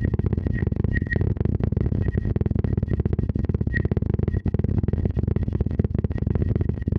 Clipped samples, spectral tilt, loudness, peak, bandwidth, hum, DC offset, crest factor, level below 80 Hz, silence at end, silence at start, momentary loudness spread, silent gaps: under 0.1%; -11.5 dB/octave; -24 LUFS; -6 dBFS; 4.7 kHz; none; under 0.1%; 16 dB; -30 dBFS; 0 s; 0 s; 1 LU; none